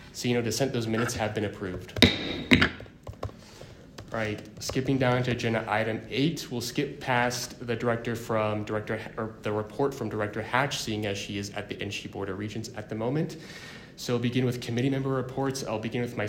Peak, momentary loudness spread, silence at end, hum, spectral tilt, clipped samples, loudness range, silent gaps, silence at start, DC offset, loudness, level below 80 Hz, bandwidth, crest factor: 0 dBFS; 12 LU; 0 s; none; -5 dB/octave; under 0.1%; 5 LU; none; 0 s; under 0.1%; -29 LUFS; -52 dBFS; 16 kHz; 28 dB